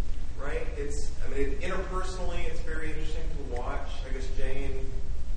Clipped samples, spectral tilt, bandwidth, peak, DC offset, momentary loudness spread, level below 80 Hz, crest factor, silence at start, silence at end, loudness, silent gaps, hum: under 0.1%; -5.5 dB/octave; 9 kHz; -12 dBFS; under 0.1%; 5 LU; -30 dBFS; 12 dB; 0 s; 0 s; -36 LUFS; none; none